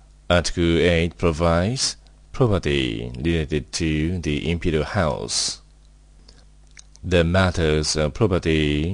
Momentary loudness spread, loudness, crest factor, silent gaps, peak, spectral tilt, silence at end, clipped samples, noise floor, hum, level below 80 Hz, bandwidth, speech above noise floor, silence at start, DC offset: 6 LU; -21 LUFS; 18 dB; none; -4 dBFS; -5 dB/octave; 0 s; under 0.1%; -50 dBFS; none; -36 dBFS; 10.5 kHz; 29 dB; 0.3 s; under 0.1%